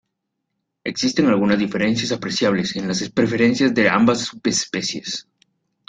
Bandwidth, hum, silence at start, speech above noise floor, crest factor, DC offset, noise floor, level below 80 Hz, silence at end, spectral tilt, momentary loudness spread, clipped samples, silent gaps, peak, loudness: 9.4 kHz; none; 0.85 s; 58 dB; 18 dB; under 0.1%; -77 dBFS; -56 dBFS; 0.7 s; -4 dB/octave; 9 LU; under 0.1%; none; -2 dBFS; -19 LUFS